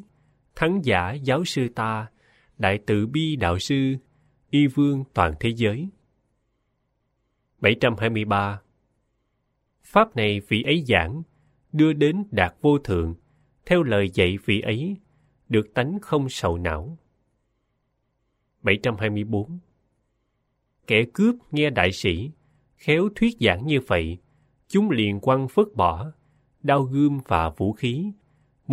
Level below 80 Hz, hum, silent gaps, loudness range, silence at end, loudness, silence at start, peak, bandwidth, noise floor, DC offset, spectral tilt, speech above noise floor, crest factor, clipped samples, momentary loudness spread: -46 dBFS; none; none; 5 LU; 0 s; -23 LUFS; 0.55 s; -2 dBFS; 15 kHz; -73 dBFS; under 0.1%; -6.5 dB/octave; 51 dB; 22 dB; under 0.1%; 11 LU